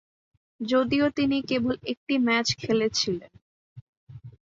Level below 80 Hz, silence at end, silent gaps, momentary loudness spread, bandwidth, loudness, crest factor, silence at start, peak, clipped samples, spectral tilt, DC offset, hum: -58 dBFS; 0.2 s; 1.97-2.07 s, 3.42-4.07 s; 7 LU; 7.8 kHz; -25 LUFS; 18 dB; 0.6 s; -10 dBFS; under 0.1%; -4 dB/octave; under 0.1%; none